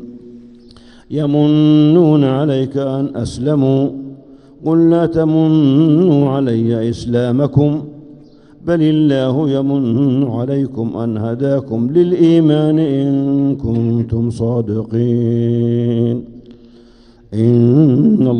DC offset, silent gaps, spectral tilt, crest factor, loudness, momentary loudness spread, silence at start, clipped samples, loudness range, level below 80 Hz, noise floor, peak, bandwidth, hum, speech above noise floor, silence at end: under 0.1%; none; -9 dB/octave; 14 dB; -14 LUFS; 9 LU; 0 s; under 0.1%; 3 LU; -46 dBFS; -44 dBFS; 0 dBFS; 9.6 kHz; none; 31 dB; 0 s